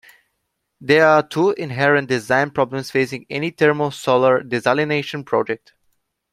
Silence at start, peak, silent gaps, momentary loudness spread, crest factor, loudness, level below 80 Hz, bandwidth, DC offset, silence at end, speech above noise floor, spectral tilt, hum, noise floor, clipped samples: 0.8 s; -2 dBFS; none; 9 LU; 18 dB; -18 LUFS; -62 dBFS; 14.5 kHz; under 0.1%; 0.75 s; 56 dB; -5.5 dB/octave; none; -74 dBFS; under 0.1%